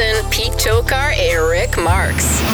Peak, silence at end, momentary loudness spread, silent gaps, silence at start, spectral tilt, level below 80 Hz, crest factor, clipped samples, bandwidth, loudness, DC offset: -2 dBFS; 0 s; 1 LU; none; 0 s; -3.5 dB/octave; -22 dBFS; 14 dB; under 0.1%; over 20 kHz; -15 LUFS; under 0.1%